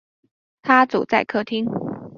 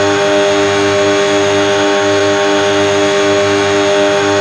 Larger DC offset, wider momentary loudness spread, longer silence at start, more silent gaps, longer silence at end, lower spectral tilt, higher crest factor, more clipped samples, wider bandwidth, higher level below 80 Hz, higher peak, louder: neither; first, 12 LU vs 0 LU; first, 0.65 s vs 0 s; neither; about the same, 0 s vs 0 s; first, -6.5 dB/octave vs -3.5 dB/octave; first, 20 dB vs 10 dB; neither; second, 7 kHz vs 12 kHz; second, -62 dBFS vs -56 dBFS; about the same, -2 dBFS vs -2 dBFS; second, -20 LUFS vs -11 LUFS